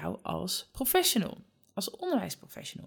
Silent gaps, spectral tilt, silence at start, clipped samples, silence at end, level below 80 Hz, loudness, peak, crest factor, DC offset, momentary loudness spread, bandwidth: none; -3 dB/octave; 0 s; under 0.1%; 0 s; -60 dBFS; -31 LUFS; -14 dBFS; 20 dB; under 0.1%; 15 LU; 19.5 kHz